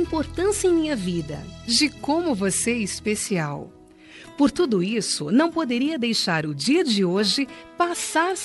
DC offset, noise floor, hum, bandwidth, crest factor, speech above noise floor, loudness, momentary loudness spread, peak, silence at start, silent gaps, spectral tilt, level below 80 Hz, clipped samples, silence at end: under 0.1%; -46 dBFS; none; 11.5 kHz; 16 dB; 23 dB; -22 LUFS; 7 LU; -6 dBFS; 0 s; none; -4 dB/octave; -50 dBFS; under 0.1%; 0 s